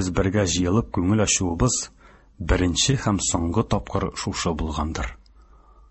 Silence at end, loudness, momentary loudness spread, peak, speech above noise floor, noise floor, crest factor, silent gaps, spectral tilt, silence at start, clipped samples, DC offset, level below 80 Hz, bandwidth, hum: 0.75 s; -23 LUFS; 8 LU; -6 dBFS; 29 dB; -51 dBFS; 18 dB; none; -4.5 dB/octave; 0 s; under 0.1%; under 0.1%; -34 dBFS; 8.6 kHz; none